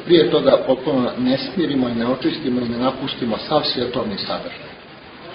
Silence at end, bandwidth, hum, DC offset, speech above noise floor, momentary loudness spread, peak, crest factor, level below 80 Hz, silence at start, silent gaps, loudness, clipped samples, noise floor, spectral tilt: 0 s; 5.6 kHz; none; under 0.1%; 21 dB; 18 LU; -2 dBFS; 18 dB; -52 dBFS; 0 s; none; -19 LUFS; under 0.1%; -40 dBFS; -9.5 dB/octave